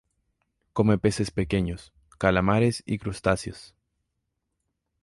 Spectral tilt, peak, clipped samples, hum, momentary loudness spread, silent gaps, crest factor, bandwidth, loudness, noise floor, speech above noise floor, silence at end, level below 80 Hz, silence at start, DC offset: -6.5 dB/octave; -8 dBFS; under 0.1%; none; 12 LU; none; 20 dB; 11.5 kHz; -25 LUFS; -80 dBFS; 55 dB; 1.4 s; -46 dBFS; 0.75 s; under 0.1%